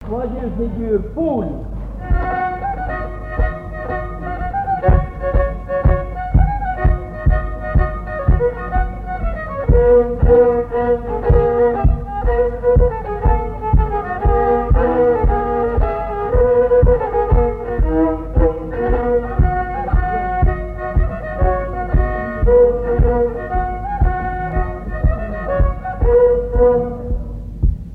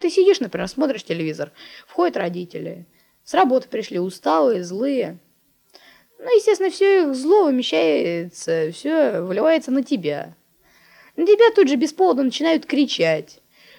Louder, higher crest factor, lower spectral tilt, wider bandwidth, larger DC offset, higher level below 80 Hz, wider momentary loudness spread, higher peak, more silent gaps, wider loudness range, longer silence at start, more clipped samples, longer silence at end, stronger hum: about the same, -18 LUFS vs -19 LUFS; about the same, 16 dB vs 16 dB; first, -11 dB/octave vs -5 dB/octave; second, 3.5 kHz vs 18 kHz; neither; first, -20 dBFS vs -66 dBFS; second, 10 LU vs 13 LU; first, 0 dBFS vs -4 dBFS; neither; about the same, 5 LU vs 4 LU; about the same, 0 s vs 0 s; neither; second, 0 s vs 0.55 s; neither